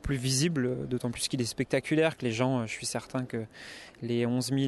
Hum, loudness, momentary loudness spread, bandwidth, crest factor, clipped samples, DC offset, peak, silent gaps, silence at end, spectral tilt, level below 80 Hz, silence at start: none; -30 LUFS; 11 LU; 12.5 kHz; 18 dB; under 0.1%; under 0.1%; -12 dBFS; none; 0 s; -5 dB/octave; -52 dBFS; 0.05 s